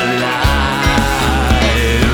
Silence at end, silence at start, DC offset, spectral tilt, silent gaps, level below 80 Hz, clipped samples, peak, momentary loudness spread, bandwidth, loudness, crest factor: 0 s; 0 s; under 0.1%; -4.5 dB/octave; none; -18 dBFS; under 0.1%; 0 dBFS; 2 LU; 19.5 kHz; -13 LUFS; 12 dB